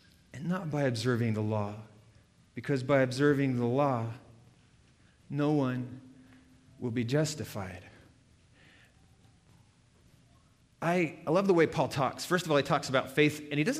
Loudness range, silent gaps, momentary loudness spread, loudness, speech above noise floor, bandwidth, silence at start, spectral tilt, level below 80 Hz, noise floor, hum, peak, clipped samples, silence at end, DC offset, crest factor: 9 LU; none; 15 LU; -30 LUFS; 34 dB; 15.5 kHz; 0.35 s; -6 dB/octave; -66 dBFS; -63 dBFS; none; -12 dBFS; under 0.1%; 0 s; under 0.1%; 20 dB